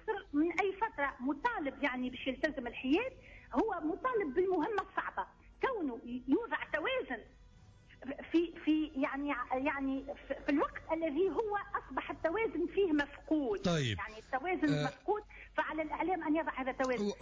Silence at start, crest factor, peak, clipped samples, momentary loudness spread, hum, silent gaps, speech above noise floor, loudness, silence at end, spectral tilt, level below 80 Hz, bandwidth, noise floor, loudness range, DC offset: 0 s; 14 dB; -22 dBFS; under 0.1%; 7 LU; none; none; 24 dB; -35 LUFS; 0 s; -6 dB/octave; -60 dBFS; 7.8 kHz; -59 dBFS; 2 LU; under 0.1%